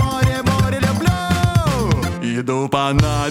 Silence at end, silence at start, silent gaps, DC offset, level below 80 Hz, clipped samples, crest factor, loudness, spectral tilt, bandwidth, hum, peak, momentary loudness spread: 0 s; 0 s; none; under 0.1%; -28 dBFS; under 0.1%; 16 dB; -18 LUFS; -6 dB/octave; 16.5 kHz; none; 0 dBFS; 4 LU